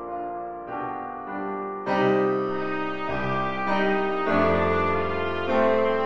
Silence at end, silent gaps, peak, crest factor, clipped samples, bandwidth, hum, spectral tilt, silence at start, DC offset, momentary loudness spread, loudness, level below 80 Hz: 0 s; none; -10 dBFS; 14 dB; under 0.1%; 7.4 kHz; none; -7.5 dB/octave; 0 s; under 0.1%; 11 LU; -25 LUFS; -46 dBFS